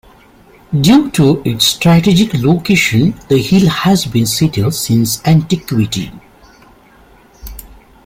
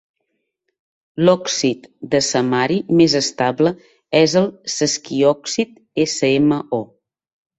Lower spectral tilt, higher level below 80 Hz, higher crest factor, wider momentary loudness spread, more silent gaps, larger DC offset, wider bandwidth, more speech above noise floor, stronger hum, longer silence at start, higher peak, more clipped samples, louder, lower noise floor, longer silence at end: about the same, -5 dB/octave vs -4.5 dB/octave; first, -38 dBFS vs -58 dBFS; second, 12 dB vs 18 dB; about the same, 9 LU vs 9 LU; neither; neither; first, 16.5 kHz vs 8.2 kHz; second, 33 dB vs 57 dB; neither; second, 0.7 s vs 1.15 s; about the same, 0 dBFS vs -2 dBFS; neither; first, -12 LUFS vs -17 LUFS; second, -44 dBFS vs -74 dBFS; second, 0.3 s vs 0.75 s